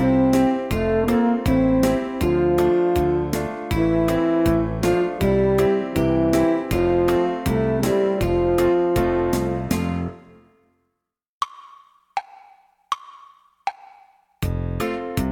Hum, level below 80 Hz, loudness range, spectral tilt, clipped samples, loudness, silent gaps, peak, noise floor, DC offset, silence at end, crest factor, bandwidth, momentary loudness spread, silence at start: none; -36 dBFS; 14 LU; -7 dB/octave; under 0.1%; -21 LUFS; 11.28-11.41 s; -6 dBFS; -79 dBFS; under 0.1%; 0 s; 14 dB; 19 kHz; 12 LU; 0 s